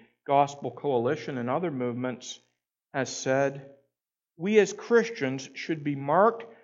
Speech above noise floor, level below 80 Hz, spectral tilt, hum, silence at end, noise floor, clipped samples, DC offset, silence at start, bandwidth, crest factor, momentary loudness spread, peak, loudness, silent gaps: 60 dB; -80 dBFS; -5 dB/octave; none; 0.1 s; -87 dBFS; under 0.1%; under 0.1%; 0.3 s; 7.8 kHz; 20 dB; 12 LU; -8 dBFS; -27 LUFS; none